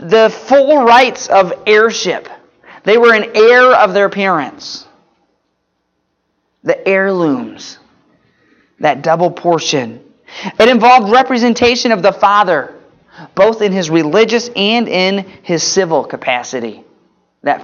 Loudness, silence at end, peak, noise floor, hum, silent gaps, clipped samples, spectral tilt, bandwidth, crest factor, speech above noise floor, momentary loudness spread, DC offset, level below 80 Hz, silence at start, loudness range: -11 LUFS; 0 s; 0 dBFS; -66 dBFS; none; none; under 0.1%; -4 dB/octave; 7.4 kHz; 12 dB; 55 dB; 16 LU; under 0.1%; -54 dBFS; 0 s; 8 LU